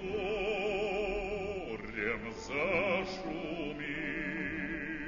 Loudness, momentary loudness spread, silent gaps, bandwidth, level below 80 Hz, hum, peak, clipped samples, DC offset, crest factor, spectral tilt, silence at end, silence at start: -35 LUFS; 7 LU; none; 7.2 kHz; -52 dBFS; none; -18 dBFS; under 0.1%; under 0.1%; 18 dB; -3.5 dB/octave; 0 s; 0 s